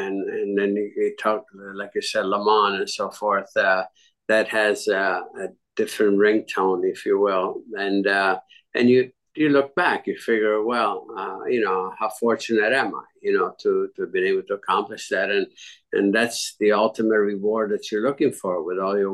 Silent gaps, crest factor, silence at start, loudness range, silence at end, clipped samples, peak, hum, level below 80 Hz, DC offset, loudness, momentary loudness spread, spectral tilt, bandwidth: none; 16 dB; 0 s; 2 LU; 0 s; under 0.1%; -6 dBFS; none; -72 dBFS; under 0.1%; -22 LUFS; 9 LU; -4.5 dB/octave; 12.5 kHz